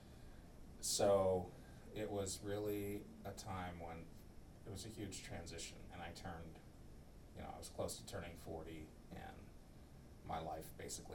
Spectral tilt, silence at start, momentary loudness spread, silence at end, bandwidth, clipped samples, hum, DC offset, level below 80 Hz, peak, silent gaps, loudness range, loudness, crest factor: -4 dB/octave; 0 s; 21 LU; 0 s; 17.5 kHz; under 0.1%; none; under 0.1%; -60 dBFS; -24 dBFS; none; 10 LU; -45 LUFS; 22 dB